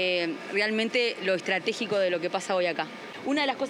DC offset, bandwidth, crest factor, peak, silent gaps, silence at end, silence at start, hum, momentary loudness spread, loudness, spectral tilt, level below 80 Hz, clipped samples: under 0.1%; 12 kHz; 16 dB; -10 dBFS; none; 0 s; 0 s; none; 4 LU; -27 LUFS; -3.5 dB/octave; -86 dBFS; under 0.1%